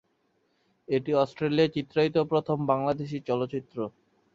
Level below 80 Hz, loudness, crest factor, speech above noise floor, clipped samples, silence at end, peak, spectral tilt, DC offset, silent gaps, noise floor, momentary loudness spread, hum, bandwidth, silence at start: -64 dBFS; -28 LUFS; 18 dB; 45 dB; under 0.1%; 0.45 s; -10 dBFS; -8 dB/octave; under 0.1%; none; -72 dBFS; 9 LU; none; 7.6 kHz; 0.9 s